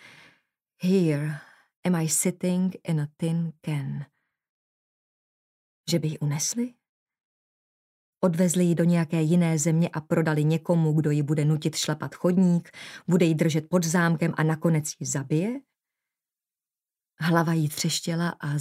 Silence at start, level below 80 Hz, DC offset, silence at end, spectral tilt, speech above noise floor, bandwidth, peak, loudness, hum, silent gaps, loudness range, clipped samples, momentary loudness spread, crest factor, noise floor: 0.8 s; -72 dBFS; under 0.1%; 0 s; -5.5 dB/octave; over 66 dB; 15.5 kHz; -6 dBFS; -25 LUFS; none; 1.76-1.83 s, 4.49-5.84 s, 6.89-7.06 s, 7.25-8.13 s; 8 LU; under 0.1%; 9 LU; 20 dB; under -90 dBFS